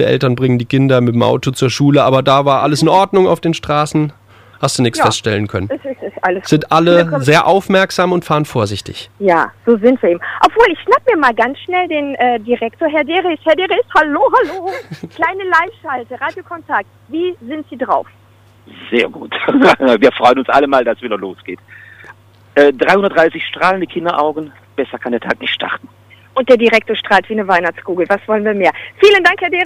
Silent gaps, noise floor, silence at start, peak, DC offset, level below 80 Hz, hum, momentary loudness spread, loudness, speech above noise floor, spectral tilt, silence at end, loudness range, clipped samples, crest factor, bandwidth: none; -41 dBFS; 0 s; 0 dBFS; under 0.1%; -50 dBFS; none; 12 LU; -13 LUFS; 28 dB; -5.5 dB/octave; 0 s; 5 LU; under 0.1%; 14 dB; 15.5 kHz